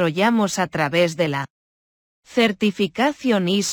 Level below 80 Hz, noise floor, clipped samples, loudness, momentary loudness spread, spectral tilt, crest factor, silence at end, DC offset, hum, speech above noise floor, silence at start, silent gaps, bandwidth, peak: -62 dBFS; under -90 dBFS; under 0.1%; -20 LUFS; 5 LU; -4.5 dB/octave; 14 dB; 0 s; under 0.1%; none; over 70 dB; 0 s; 1.50-2.23 s; 19.5 kHz; -6 dBFS